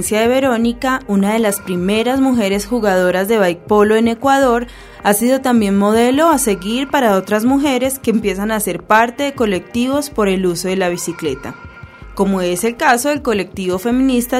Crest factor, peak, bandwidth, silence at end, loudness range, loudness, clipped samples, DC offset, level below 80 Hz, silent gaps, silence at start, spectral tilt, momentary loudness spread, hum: 14 dB; 0 dBFS; 16 kHz; 0 s; 4 LU; -15 LUFS; under 0.1%; under 0.1%; -40 dBFS; none; 0 s; -4.5 dB/octave; 7 LU; none